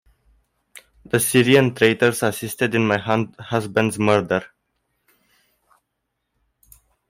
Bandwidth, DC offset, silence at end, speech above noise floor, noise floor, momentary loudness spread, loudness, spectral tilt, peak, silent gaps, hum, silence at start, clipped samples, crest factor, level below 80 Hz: 16 kHz; under 0.1%; 2.65 s; 58 dB; -77 dBFS; 10 LU; -19 LUFS; -5 dB/octave; -4 dBFS; none; none; 1.15 s; under 0.1%; 18 dB; -58 dBFS